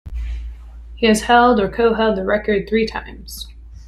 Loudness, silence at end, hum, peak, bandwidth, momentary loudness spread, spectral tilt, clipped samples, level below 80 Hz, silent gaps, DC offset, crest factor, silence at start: -16 LUFS; 0 s; none; -2 dBFS; 14.5 kHz; 20 LU; -5 dB/octave; under 0.1%; -32 dBFS; none; under 0.1%; 16 dB; 0.05 s